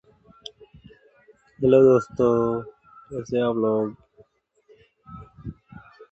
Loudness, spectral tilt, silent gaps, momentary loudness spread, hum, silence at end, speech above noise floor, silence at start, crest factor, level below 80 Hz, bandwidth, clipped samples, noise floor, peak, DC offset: -21 LUFS; -8 dB/octave; none; 26 LU; none; 0.35 s; 40 dB; 1.6 s; 20 dB; -54 dBFS; 7.8 kHz; under 0.1%; -61 dBFS; -6 dBFS; under 0.1%